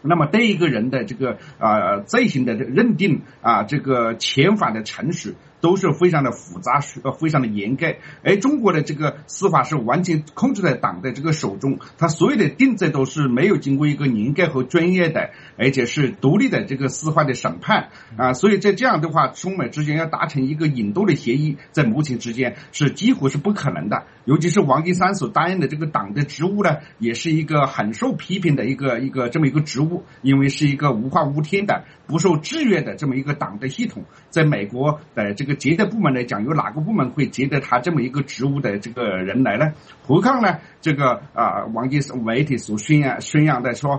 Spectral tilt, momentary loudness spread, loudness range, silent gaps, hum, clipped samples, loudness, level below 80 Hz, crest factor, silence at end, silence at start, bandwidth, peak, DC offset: -6 dB/octave; 7 LU; 2 LU; none; none; under 0.1%; -20 LUFS; -58 dBFS; 18 dB; 0 s; 0.05 s; 8.4 kHz; -2 dBFS; under 0.1%